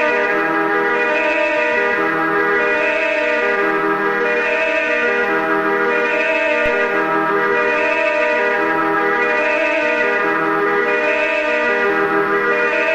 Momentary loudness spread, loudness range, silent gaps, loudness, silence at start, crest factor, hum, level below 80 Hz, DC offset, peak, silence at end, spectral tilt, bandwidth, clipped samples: 1 LU; 0 LU; none; -16 LUFS; 0 s; 12 dB; none; -50 dBFS; under 0.1%; -4 dBFS; 0 s; -4.5 dB/octave; 15 kHz; under 0.1%